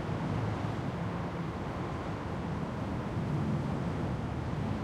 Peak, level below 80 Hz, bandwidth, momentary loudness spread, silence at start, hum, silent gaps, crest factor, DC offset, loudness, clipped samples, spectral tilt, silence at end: -22 dBFS; -48 dBFS; 11.5 kHz; 4 LU; 0 s; none; none; 12 dB; under 0.1%; -35 LUFS; under 0.1%; -8 dB/octave; 0 s